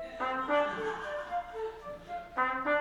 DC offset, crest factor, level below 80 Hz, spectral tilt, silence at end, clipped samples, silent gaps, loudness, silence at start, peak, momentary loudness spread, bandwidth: under 0.1%; 18 dB; -60 dBFS; -4.5 dB/octave; 0 s; under 0.1%; none; -34 LUFS; 0 s; -16 dBFS; 11 LU; 11.5 kHz